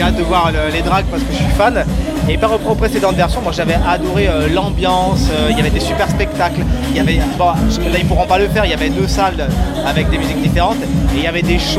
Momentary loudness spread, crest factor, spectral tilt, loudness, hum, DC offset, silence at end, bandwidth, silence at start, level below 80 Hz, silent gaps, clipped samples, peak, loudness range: 3 LU; 12 dB; -5.5 dB/octave; -14 LUFS; none; under 0.1%; 0 s; 15.5 kHz; 0 s; -20 dBFS; none; under 0.1%; 0 dBFS; 1 LU